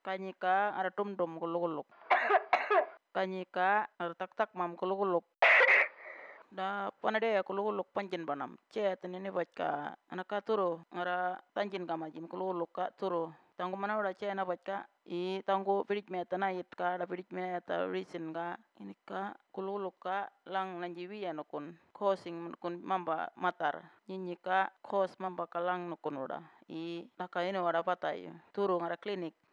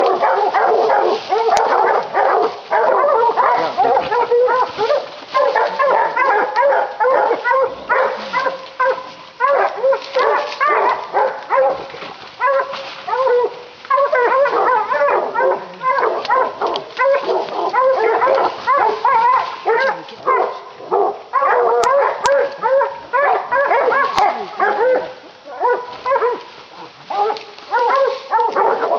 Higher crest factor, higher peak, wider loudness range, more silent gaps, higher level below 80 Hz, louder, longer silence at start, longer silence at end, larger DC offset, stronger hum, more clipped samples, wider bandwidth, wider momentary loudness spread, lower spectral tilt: first, 22 dB vs 16 dB; second, -14 dBFS vs 0 dBFS; first, 10 LU vs 3 LU; neither; second, under -90 dBFS vs -62 dBFS; second, -35 LUFS vs -16 LUFS; about the same, 0.05 s vs 0 s; first, 0.2 s vs 0 s; neither; neither; neither; second, 8 kHz vs 9.4 kHz; first, 12 LU vs 7 LU; first, -6 dB/octave vs -3 dB/octave